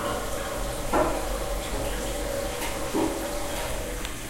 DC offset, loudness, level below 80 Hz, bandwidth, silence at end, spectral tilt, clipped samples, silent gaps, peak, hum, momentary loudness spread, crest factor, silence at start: under 0.1%; -29 LUFS; -36 dBFS; 16 kHz; 0 s; -4 dB/octave; under 0.1%; none; -10 dBFS; none; 6 LU; 18 dB; 0 s